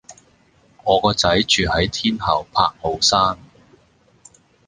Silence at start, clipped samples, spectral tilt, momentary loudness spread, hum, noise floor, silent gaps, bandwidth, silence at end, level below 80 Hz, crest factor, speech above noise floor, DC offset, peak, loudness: 0.1 s; under 0.1%; -3.5 dB/octave; 6 LU; none; -56 dBFS; none; 10 kHz; 1.3 s; -40 dBFS; 20 dB; 38 dB; under 0.1%; 0 dBFS; -18 LUFS